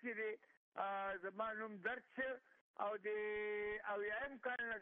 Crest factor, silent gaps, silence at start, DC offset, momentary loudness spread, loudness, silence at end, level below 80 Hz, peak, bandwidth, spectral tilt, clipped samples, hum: 16 dB; 0.57-0.72 s, 2.61-2.74 s; 0 s; under 0.1%; 4 LU; -45 LUFS; 0 s; -78 dBFS; -30 dBFS; 3.9 kHz; -1.5 dB/octave; under 0.1%; none